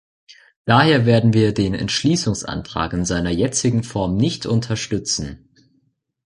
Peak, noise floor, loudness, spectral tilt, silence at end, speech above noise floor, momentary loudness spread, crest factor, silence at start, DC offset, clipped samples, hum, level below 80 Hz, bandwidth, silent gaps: -2 dBFS; -66 dBFS; -19 LUFS; -5 dB/octave; 0.9 s; 47 dB; 10 LU; 18 dB; 0.3 s; under 0.1%; under 0.1%; none; -40 dBFS; 11.5 kHz; 0.56-0.65 s